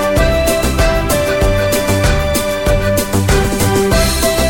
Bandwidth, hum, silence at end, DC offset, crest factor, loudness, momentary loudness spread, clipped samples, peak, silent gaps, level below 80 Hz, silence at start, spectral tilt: 19 kHz; none; 0 s; under 0.1%; 12 dB; -13 LUFS; 2 LU; under 0.1%; 0 dBFS; none; -18 dBFS; 0 s; -4.5 dB/octave